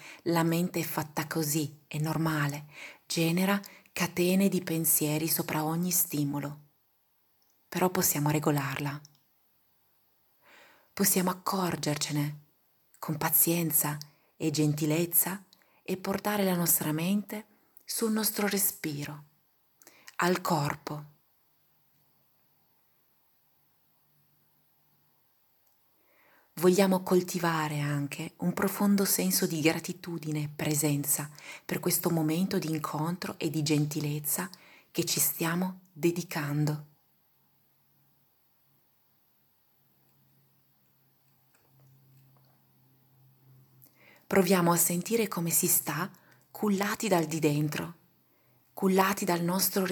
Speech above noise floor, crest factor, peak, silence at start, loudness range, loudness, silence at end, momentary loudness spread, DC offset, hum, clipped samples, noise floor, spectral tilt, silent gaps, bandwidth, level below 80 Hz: 42 dB; 22 dB; -10 dBFS; 0 s; 6 LU; -29 LUFS; 0 s; 13 LU; under 0.1%; none; under 0.1%; -71 dBFS; -4.5 dB/octave; none; 19 kHz; -72 dBFS